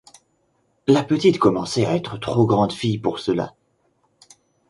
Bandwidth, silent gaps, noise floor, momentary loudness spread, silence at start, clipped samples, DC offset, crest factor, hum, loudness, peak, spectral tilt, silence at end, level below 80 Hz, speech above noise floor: 11.5 kHz; none; -66 dBFS; 8 LU; 0.85 s; under 0.1%; under 0.1%; 20 dB; none; -20 LUFS; -2 dBFS; -6.5 dB/octave; 1.2 s; -54 dBFS; 47 dB